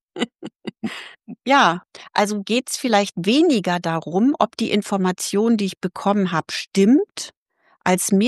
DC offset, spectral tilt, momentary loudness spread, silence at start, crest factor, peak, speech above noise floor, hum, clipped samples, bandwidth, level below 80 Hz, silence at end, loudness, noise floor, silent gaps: under 0.1%; -4.5 dB/octave; 15 LU; 0.15 s; 18 dB; -2 dBFS; 41 dB; none; under 0.1%; 12.5 kHz; -68 dBFS; 0 s; -20 LUFS; -60 dBFS; 6.67-6.71 s, 7.37-7.46 s